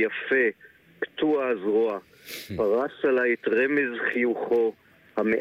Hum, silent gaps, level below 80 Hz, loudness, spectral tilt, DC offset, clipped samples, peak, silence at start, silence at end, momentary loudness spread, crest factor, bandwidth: none; none; -66 dBFS; -25 LUFS; -5.5 dB/octave; under 0.1%; under 0.1%; -12 dBFS; 0 s; 0 s; 12 LU; 12 dB; 16 kHz